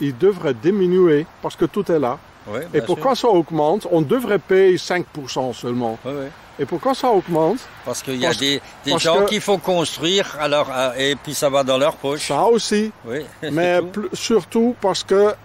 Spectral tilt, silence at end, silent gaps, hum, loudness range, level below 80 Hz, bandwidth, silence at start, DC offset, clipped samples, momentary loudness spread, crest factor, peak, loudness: -4.5 dB/octave; 0.1 s; none; none; 3 LU; -54 dBFS; 16 kHz; 0 s; under 0.1%; under 0.1%; 10 LU; 14 dB; -4 dBFS; -19 LUFS